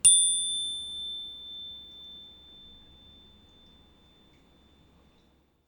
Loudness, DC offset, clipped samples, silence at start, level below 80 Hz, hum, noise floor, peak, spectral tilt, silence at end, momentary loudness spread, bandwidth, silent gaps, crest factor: -26 LUFS; under 0.1%; under 0.1%; 0.05 s; -62 dBFS; none; -65 dBFS; -8 dBFS; 2.5 dB/octave; 3.4 s; 28 LU; 19 kHz; none; 22 dB